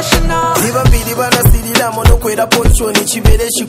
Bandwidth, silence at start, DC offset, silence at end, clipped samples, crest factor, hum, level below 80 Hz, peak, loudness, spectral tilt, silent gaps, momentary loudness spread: 16.5 kHz; 0 s; under 0.1%; 0 s; 2%; 10 dB; none; -14 dBFS; 0 dBFS; -11 LUFS; -4 dB/octave; none; 3 LU